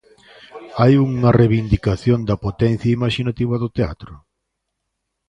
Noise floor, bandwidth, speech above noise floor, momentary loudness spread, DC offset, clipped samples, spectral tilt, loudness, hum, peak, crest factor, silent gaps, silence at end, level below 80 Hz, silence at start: -76 dBFS; 8.4 kHz; 59 dB; 10 LU; under 0.1%; under 0.1%; -8.5 dB/octave; -18 LUFS; none; -2 dBFS; 18 dB; none; 1.15 s; -36 dBFS; 0.55 s